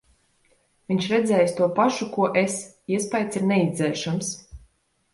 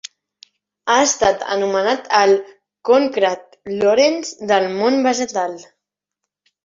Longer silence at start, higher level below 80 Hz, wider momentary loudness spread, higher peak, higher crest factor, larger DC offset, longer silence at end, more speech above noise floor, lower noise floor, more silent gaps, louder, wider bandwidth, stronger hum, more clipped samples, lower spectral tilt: about the same, 0.9 s vs 0.85 s; about the same, -56 dBFS vs -56 dBFS; second, 8 LU vs 14 LU; second, -8 dBFS vs -2 dBFS; about the same, 18 dB vs 16 dB; neither; second, 0.55 s vs 1.05 s; second, 41 dB vs 64 dB; second, -64 dBFS vs -81 dBFS; neither; second, -23 LUFS vs -17 LUFS; first, 11.5 kHz vs 7.8 kHz; neither; neither; first, -5 dB/octave vs -2.5 dB/octave